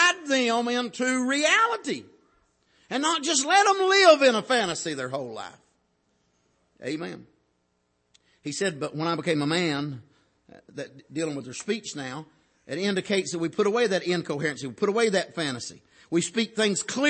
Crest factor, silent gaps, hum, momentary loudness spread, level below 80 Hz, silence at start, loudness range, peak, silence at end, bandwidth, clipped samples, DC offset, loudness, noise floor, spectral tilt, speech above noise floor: 22 dB; none; none; 17 LU; -72 dBFS; 0 s; 13 LU; -4 dBFS; 0 s; 8.8 kHz; under 0.1%; under 0.1%; -25 LUFS; -73 dBFS; -3 dB/octave; 47 dB